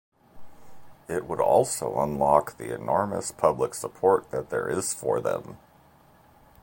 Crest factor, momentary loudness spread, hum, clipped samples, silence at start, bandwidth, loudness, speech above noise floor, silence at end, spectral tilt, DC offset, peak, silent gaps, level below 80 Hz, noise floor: 22 dB; 11 LU; none; under 0.1%; 0.35 s; 17 kHz; -26 LUFS; 31 dB; 1.05 s; -4.5 dB/octave; under 0.1%; -4 dBFS; none; -56 dBFS; -57 dBFS